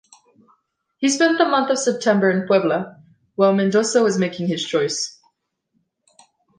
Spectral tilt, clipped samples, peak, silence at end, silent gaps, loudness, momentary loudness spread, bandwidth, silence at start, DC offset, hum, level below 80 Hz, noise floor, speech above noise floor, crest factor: -4.5 dB/octave; under 0.1%; -4 dBFS; 1.5 s; none; -19 LUFS; 8 LU; 10 kHz; 1 s; under 0.1%; none; -70 dBFS; -71 dBFS; 53 dB; 16 dB